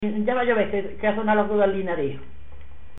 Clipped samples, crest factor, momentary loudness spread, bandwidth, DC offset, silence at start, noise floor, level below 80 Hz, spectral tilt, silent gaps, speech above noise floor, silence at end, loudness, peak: under 0.1%; 16 dB; 7 LU; 4 kHz; 3%; 0 s; -45 dBFS; -48 dBFS; -10.5 dB/octave; none; 23 dB; 0.1 s; -23 LUFS; -8 dBFS